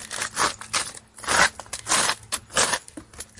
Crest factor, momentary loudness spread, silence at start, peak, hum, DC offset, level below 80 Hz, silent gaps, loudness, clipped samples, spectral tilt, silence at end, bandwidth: 22 dB; 14 LU; 0 s; -4 dBFS; none; under 0.1%; -54 dBFS; none; -23 LUFS; under 0.1%; 0 dB/octave; 0.15 s; 11.5 kHz